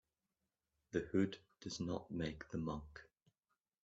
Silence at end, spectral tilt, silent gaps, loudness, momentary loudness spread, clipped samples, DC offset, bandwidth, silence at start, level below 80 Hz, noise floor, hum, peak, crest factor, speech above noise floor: 0.8 s; -6 dB/octave; none; -43 LUFS; 13 LU; under 0.1%; under 0.1%; 7.6 kHz; 0.95 s; -66 dBFS; under -90 dBFS; none; -24 dBFS; 22 dB; over 48 dB